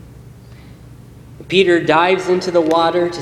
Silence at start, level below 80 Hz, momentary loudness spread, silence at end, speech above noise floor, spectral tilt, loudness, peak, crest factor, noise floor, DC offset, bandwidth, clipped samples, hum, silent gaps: 0.1 s; -48 dBFS; 4 LU; 0 s; 24 dB; -5.5 dB/octave; -14 LUFS; 0 dBFS; 16 dB; -39 dBFS; under 0.1%; 11.5 kHz; under 0.1%; none; none